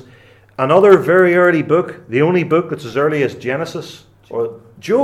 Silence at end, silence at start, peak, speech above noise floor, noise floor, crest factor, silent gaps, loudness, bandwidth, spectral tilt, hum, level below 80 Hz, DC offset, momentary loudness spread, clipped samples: 0 s; 0.6 s; 0 dBFS; 31 dB; -45 dBFS; 16 dB; none; -14 LUFS; 13 kHz; -7 dB/octave; none; -58 dBFS; under 0.1%; 17 LU; under 0.1%